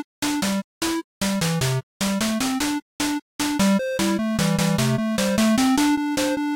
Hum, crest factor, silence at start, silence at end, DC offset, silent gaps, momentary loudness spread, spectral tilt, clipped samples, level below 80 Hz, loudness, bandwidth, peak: none; 12 dB; 0 s; 0 s; under 0.1%; 0.04-0.22 s, 0.64-0.81 s, 1.04-1.21 s, 1.83-2.00 s, 2.82-2.99 s, 3.22-3.39 s; 7 LU; -4.5 dB/octave; under 0.1%; -48 dBFS; -22 LUFS; 17 kHz; -10 dBFS